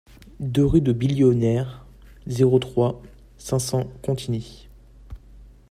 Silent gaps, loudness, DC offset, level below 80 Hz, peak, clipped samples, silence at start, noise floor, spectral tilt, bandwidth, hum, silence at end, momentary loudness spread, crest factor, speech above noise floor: none; -22 LUFS; under 0.1%; -42 dBFS; -6 dBFS; under 0.1%; 0.4 s; -47 dBFS; -7 dB/octave; 15 kHz; none; 0.25 s; 15 LU; 18 dB; 26 dB